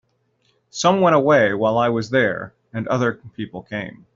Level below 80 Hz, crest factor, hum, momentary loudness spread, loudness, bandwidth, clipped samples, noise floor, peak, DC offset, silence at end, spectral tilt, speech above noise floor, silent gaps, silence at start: -58 dBFS; 18 dB; none; 17 LU; -19 LUFS; 7.8 kHz; under 0.1%; -65 dBFS; -4 dBFS; under 0.1%; 0.25 s; -4.5 dB/octave; 46 dB; none; 0.75 s